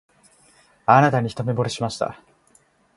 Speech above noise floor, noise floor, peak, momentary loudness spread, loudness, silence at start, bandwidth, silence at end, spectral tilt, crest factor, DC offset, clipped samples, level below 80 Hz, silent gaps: 39 dB; -59 dBFS; 0 dBFS; 13 LU; -21 LUFS; 0.9 s; 11.5 kHz; 0.85 s; -6 dB/octave; 22 dB; under 0.1%; under 0.1%; -58 dBFS; none